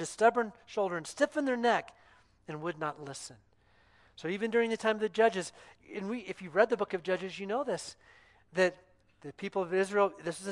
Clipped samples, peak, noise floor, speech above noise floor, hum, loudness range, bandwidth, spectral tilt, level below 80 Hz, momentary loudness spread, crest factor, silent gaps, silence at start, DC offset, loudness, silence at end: under 0.1%; -10 dBFS; -65 dBFS; 33 dB; none; 4 LU; 11.5 kHz; -4.5 dB/octave; -74 dBFS; 15 LU; 22 dB; none; 0 s; under 0.1%; -32 LUFS; 0 s